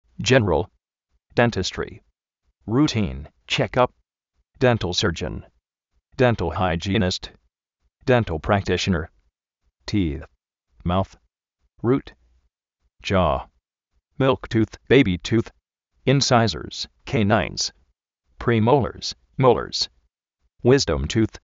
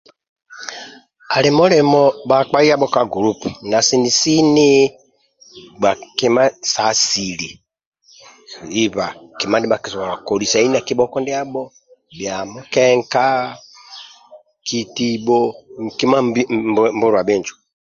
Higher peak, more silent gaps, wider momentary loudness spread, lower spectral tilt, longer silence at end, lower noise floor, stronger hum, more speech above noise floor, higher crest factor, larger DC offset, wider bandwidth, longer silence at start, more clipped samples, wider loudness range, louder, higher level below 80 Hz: second, -4 dBFS vs 0 dBFS; second, none vs 7.86-7.92 s; second, 13 LU vs 17 LU; about the same, -4.5 dB/octave vs -3.5 dB/octave; second, 0.1 s vs 0.3 s; first, -73 dBFS vs -51 dBFS; neither; first, 52 dB vs 35 dB; about the same, 20 dB vs 16 dB; neither; about the same, 7.8 kHz vs 7.8 kHz; second, 0.2 s vs 0.5 s; neither; about the same, 6 LU vs 6 LU; second, -22 LUFS vs -16 LUFS; first, -42 dBFS vs -56 dBFS